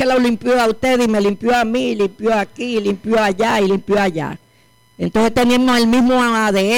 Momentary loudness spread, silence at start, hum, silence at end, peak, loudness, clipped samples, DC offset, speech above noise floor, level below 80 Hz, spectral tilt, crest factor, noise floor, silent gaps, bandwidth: 7 LU; 0 s; none; 0 s; -8 dBFS; -16 LUFS; under 0.1%; under 0.1%; 38 dB; -44 dBFS; -5 dB/octave; 8 dB; -53 dBFS; none; 17 kHz